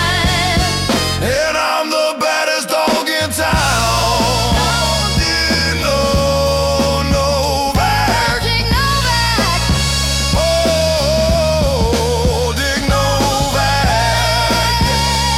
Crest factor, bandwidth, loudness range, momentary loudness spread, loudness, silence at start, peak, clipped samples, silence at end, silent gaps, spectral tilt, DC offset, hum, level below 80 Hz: 10 dB; 17.5 kHz; 1 LU; 2 LU; -14 LUFS; 0 s; -4 dBFS; under 0.1%; 0 s; none; -3.5 dB/octave; under 0.1%; none; -24 dBFS